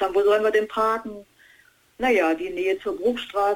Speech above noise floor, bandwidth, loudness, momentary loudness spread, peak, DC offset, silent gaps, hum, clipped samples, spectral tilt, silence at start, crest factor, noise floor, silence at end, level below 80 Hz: 34 dB; 18 kHz; -23 LUFS; 8 LU; -8 dBFS; under 0.1%; none; none; under 0.1%; -4 dB/octave; 0 s; 14 dB; -57 dBFS; 0 s; -56 dBFS